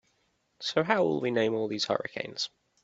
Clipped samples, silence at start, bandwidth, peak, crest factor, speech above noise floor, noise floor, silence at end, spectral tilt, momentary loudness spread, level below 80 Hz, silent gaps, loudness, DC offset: under 0.1%; 0.6 s; 8 kHz; -8 dBFS; 22 dB; 44 dB; -73 dBFS; 0.35 s; -4.5 dB/octave; 10 LU; -72 dBFS; none; -29 LUFS; under 0.1%